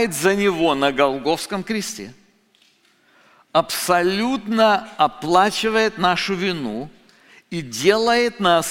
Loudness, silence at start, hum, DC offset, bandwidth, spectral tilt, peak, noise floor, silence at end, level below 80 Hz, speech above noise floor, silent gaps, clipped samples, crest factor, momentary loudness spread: -19 LUFS; 0 s; none; under 0.1%; 16.5 kHz; -4 dB/octave; -2 dBFS; -59 dBFS; 0 s; -54 dBFS; 40 dB; none; under 0.1%; 18 dB; 12 LU